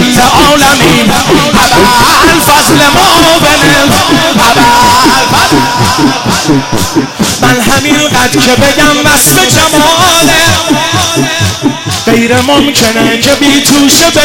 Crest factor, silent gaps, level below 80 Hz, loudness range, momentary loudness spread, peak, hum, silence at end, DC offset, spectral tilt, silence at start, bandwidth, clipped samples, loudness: 6 dB; none; -26 dBFS; 3 LU; 5 LU; 0 dBFS; none; 0 s; under 0.1%; -3 dB/octave; 0 s; over 20 kHz; 2%; -5 LUFS